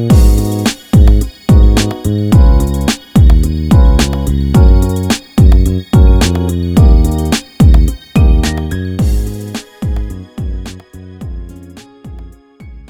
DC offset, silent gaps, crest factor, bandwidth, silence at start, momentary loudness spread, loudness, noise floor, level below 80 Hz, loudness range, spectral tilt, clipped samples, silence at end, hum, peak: under 0.1%; none; 10 dB; 15.5 kHz; 0 s; 16 LU; -11 LUFS; -34 dBFS; -12 dBFS; 11 LU; -6.5 dB/octave; under 0.1%; 0.1 s; none; 0 dBFS